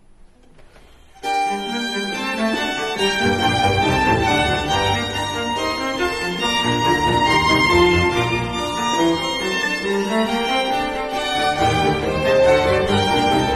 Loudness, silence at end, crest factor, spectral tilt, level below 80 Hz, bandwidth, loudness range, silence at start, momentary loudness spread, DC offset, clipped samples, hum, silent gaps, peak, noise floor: -18 LUFS; 0 s; 16 dB; -4.5 dB/octave; -38 dBFS; 13 kHz; 3 LU; 1.2 s; 8 LU; under 0.1%; under 0.1%; none; none; -2 dBFS; -46 dBFS